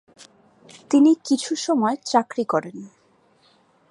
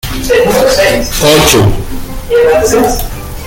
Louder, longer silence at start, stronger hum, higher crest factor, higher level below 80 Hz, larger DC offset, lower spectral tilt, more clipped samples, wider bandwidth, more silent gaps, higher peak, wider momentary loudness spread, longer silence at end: second, -21 LUFS vs -8 LUFS; first, 0.9 s vs 0.05 s; neither; first, 20 dB vs 10 dB; second, -78 dBFS vs -22 dBFS; neither; about the same, -4.5 dB/octave vs -4 dB/octave; second, under 0.1% vs 0.1%; second, 11.5 kHz vs 17.5 kHz; neither; about the same, -2 dBFS vs 0 dBFS; second, 9 LU vs 14 LU; first, 1.05 s vs 0 s